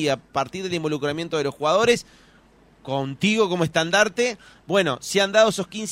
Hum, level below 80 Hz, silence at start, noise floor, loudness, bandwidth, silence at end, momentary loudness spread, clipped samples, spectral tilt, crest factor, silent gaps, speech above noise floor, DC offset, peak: none; -58 dBFS; 0 s; -54 dBFS; -22 LUFS; 16 kHz; 0 s; 9 LU; under 0.1%; -4 dB/octave; 18 dB; none; 32 dB; under 0.1%; -4 dBFS